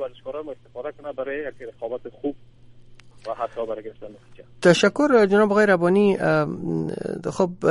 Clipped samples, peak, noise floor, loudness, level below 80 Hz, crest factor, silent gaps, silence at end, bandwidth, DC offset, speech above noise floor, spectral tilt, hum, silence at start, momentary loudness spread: under 0.1%; -2 dBFS; -46 dBFS; -21 LUFS; -56 dBFS; 20 dB; none; 0 s; 11.5 kHz; under 0.1%; 24 dB; -6 dB/octave; none; 0 s; 18 LU